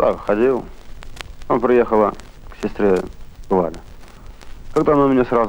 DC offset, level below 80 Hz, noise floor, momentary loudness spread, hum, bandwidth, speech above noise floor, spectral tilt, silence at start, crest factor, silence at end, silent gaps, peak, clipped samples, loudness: under 0.1%; -36 dBFS; -37 dBFS; 21 LU; none; 16.5 kHz; 20 dB; -7.5 dB/octave; 0 s; 16 dB; 0 s; none; -4 dBFS; under 0.1%; -18 LUFS